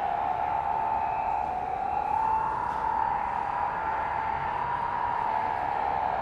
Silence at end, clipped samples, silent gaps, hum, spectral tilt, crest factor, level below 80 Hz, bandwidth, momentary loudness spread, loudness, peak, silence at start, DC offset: 0 s; under 0.1%; none; none; -6 dB/octave; 14 dB; -50 dBFS; 8.8 kHz; 2 LU; -29 LUFS; -14 dBFS; 0 s; under 0.1%